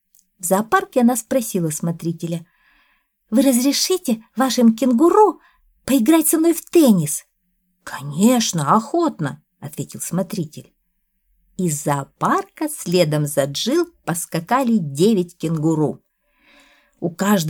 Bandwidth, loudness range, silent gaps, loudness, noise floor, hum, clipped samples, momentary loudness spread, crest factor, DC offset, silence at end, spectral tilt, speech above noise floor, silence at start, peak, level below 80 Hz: 20 kHz; 7 LU; none; -18 LUFS; -69 dBFS; none; under 0.1%; 14 LU; 16 dB; under 0.1%; 0 s; -5 dB/octave; 51 dB; 0.45 s; -2 dBFS; -60 dBFS